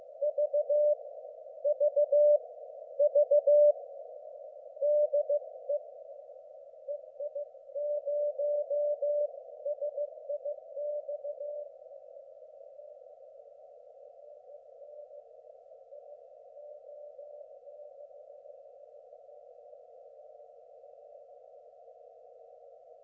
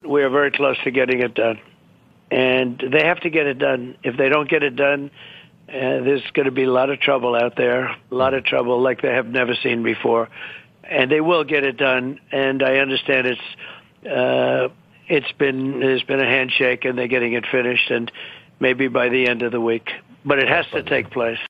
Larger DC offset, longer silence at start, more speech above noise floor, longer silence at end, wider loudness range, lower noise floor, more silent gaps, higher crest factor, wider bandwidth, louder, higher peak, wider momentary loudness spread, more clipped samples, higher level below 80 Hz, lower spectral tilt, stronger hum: neither; about the same, 0 s vs 0.05 s; second, 29 dB vs 33 dB; first, 1.15 s vs 0 s; first, 25 LU vs 1 LU; about the same, -55 dBFS vs -53 dBFS; neither; about the same, 18 dB vs 18 dB; second, 0.8 kHz vs 5.6 kHz; second, -31 LUFS vs -19 LUFS; second, -16 dBFS vs 0 dBFS; first, 27 LU vs 9 LU; neither; second, under -90 dBFS vs -62 dBFS; second, -4 dB/octave vs -7 dB/octave; first, 50 Hz at -95 dBFS vs none